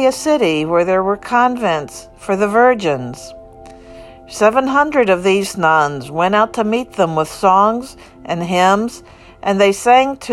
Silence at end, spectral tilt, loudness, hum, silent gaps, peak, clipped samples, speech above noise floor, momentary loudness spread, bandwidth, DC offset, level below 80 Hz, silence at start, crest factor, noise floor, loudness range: 0 s; -5 dB/octave; -15 LUFS; none; none; 0 dBFS; under 0.1%; 23 dB; 13 LU; 14 kHz; under 0.1%; -48 dBFS; 0 s; 14 dB; -38 dBFS; 3 LU